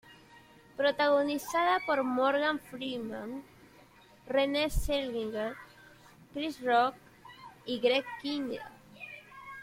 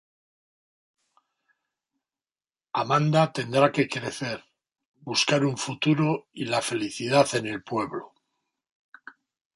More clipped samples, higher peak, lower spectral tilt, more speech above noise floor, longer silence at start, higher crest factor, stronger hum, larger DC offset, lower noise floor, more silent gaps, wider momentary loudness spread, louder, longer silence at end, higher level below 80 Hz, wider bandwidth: neither; second, -14 dBFS vs -6 dBFS; about the same, -4 dB/octave vs -5 dB/octave; second, 28 dB vs over 65 dB; second, 0.05 s vs 2.75 s; about the same, 18 dB vs 22 dB; neither; neither; second, -58 dBFS vs under -90 dBFS; second, none vs 4.85-4.94 s; first, 19 LU vs 11 LU; second, -31 LUFS vs -25 LUFS; second, 0 s vs 1.5 s; first, -48 dBFS vs -68 dBFS; first, 16.5 kHz vs 11.5 kHz